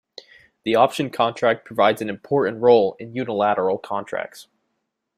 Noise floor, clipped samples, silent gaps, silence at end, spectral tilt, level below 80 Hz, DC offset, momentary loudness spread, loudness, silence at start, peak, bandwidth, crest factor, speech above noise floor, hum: -76 dBFS; under 0.1%; none; 0.75 s; -5.5 dB/octave; -64 dBFS; under 0.1%; 13 LU; -21 LUFS; 0.65 s; -2 dBFS; 14.5 kHz; 20 dB; 56 dB; none